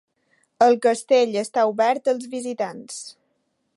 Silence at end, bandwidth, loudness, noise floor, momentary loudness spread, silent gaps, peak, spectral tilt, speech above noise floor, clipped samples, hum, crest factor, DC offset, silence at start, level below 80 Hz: 0.65 s; 11.5 kHz; -21 LUFS; -71 dBFS; 17 LU; none; -4 dBFS; -3.5 dB/octave; 51 dB; under 0.1%; none; 18 dB; under 0.1%; 0.6 s; -80 dBFS